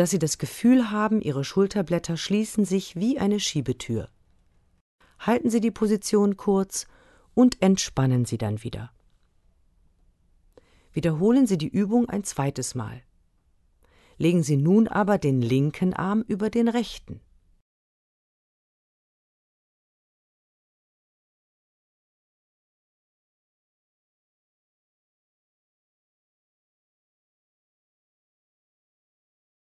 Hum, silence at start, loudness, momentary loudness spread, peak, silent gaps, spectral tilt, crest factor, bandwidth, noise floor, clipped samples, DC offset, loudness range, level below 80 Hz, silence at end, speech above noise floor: none; 0 s; -24 LUFS; 12 LU; -8 dBFS; 4.81-4.99 s; -6 dB/octave; 20 dB; 12.5 kHz; -64 dBFS; under 0.1%; under 0.1%; 6 LU; -56 dBFS; 12.55 s; 41 dB